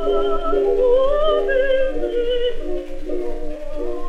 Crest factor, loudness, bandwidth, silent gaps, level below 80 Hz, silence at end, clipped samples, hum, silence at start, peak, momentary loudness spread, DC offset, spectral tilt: 12 dB; -20 LUFS; 4.6 kHz; none; -26 dBFS; 0 s; under 0.1%; none; 0 s; -6 dBFS; 13 LU; under 0.1%; -6 dB/octave